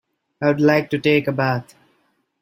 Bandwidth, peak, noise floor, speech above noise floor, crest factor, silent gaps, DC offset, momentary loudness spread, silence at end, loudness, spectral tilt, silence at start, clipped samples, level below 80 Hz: 15.5 kHz; -2 dBFS; -65 dBFS; 47 dB; 18 dB; none; under 0.1%; 6 LU; 0.8 s; -19 LUFS; -7.5 dB/octave; 0.4 s; under 0.1%; -60 dBFS